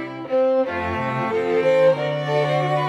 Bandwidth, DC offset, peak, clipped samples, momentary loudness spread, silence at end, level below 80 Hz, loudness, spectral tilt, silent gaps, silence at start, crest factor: 8.4 kHz; under 0.1%; -8 dBFS; under 0.1%; 7 LU; 0 s; -54 dBFS; -20 LUFS; -7 dB/octave; none; 0 s; 12 dB